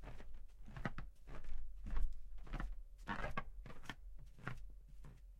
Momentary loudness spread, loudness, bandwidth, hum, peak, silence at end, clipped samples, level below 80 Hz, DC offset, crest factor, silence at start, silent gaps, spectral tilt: 14 LU; -52 LUFS; 6.6 kHz; none; -24 dBFS; 0 s; under 0.1%; -48 dBFS; under 0.1%; 18 dB; 0 s; none; -6 dB/octave